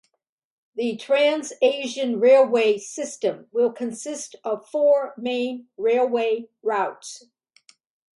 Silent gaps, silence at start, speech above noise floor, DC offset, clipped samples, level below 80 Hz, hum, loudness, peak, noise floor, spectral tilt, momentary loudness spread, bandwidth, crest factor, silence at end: none; 0.75 s; 51 dB; under 0.1%; under 0.1%; -78 dBFS; none; -22 LUFS; -6 dBFS; -72 dBFS; -3 dB/octave; 14 LU; 11.5 kHz; 16 dB; 1 s